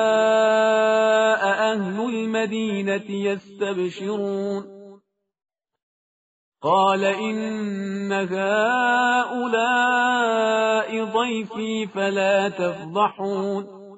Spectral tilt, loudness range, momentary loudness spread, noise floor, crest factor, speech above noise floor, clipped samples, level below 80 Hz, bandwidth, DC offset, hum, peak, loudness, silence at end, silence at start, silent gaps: -2.5 dB/octave; 7 LU; 9 LU; -55 dBFS; 16 dB; 32 dB; under 0.1%; -70 dBFS; 8 kHz; under 0.1%; none; -6 dBFS; -22 LUFS; 0 s; 0 s; 5.82-6.52 s